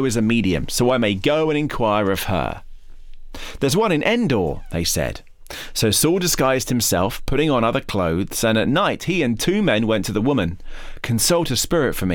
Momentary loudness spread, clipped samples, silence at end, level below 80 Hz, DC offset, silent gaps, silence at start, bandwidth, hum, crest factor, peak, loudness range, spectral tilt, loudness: 10 LU; under 0.1%; 0 s; -36 dBFS; under 0.1%; none; 0 s; 19.5 kHz; none; 14 dB; -6 dBFS; 3 LU; -4.5 dB/octave; -19 LUFS